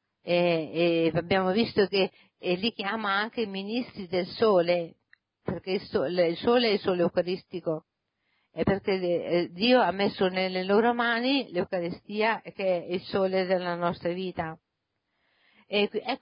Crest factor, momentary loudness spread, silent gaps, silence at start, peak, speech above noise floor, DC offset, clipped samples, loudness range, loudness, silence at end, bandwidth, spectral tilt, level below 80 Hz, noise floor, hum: 16 dB; 10 LU; none; 0.25 s; -12 dBFS; 54 dB; under 0.1%; under 0.1%; 4 LU; -27 LUFS; 0.05 s; 5.4 kHz; -10 dB/octave; -60 dBFS; -81 dBFS; none